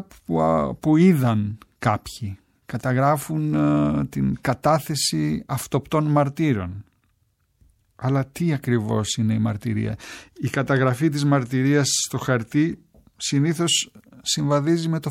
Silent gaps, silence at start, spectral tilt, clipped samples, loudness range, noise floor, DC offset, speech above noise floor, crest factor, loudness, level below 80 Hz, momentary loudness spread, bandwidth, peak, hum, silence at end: none; 0 s; -5 dB/octave; under 0.1%; 4 LU; -67 dBFS; under 0.1%; 46 dB; 18 dB; -22 LUFS; -50 dBFS; 10 LU; 16.5 kHz; -4 dBFS; none; 0 s